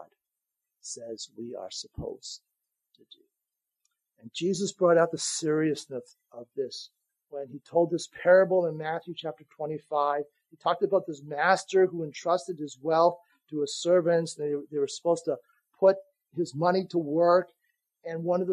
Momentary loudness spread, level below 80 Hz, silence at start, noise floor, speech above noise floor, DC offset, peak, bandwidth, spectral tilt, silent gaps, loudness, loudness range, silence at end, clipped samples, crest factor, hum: 17 LU; -66 dBFS; 0 s; -87 dBFS; 60 dB; under 0.1%; -8 dBFS; 11.5 kHz; -4.5 dB/octave; none; -27 LUFS; 12 LU; 0 s; under 0.1%; 20 dB; none